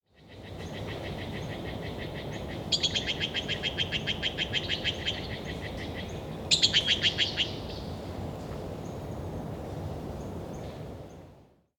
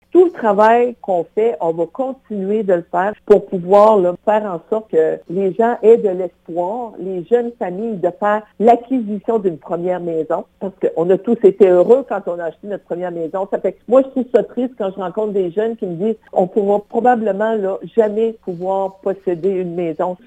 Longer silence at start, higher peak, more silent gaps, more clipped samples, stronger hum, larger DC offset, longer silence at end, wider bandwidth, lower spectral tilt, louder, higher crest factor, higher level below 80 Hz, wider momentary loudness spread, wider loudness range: about the same, 0.2 s vs 0.15 s; second, -8 dBFS vs 0 dBFS; neither; neither; neither; neither; first, 0.35 s vs 0.1 s; first, 19 kHz vs 9 kHz; second, -3 dB/octave vs -8.5 dB/octave; second, -31 LUFS vs -17 LUFS; first, 26 dB vs 16 dB; first, -48 dBFS vs -60 dBFS; first, 16 LU vs 11 LU; first, 11 LU vs 4 LU